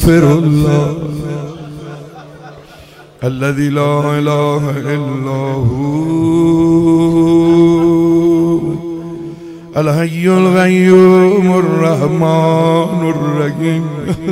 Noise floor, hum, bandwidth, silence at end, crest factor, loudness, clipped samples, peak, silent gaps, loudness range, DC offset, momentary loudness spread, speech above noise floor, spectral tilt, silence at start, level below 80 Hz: -38 dBFS; none; 15.5 kHz; 0 s; 12 dB; -12 LUFS; 0.5%; 0 dBFS; none; 7 LU; under 0.1%; 14 LU; 27 dB; -7.5 dB/octave; 0 s; -34 dBFS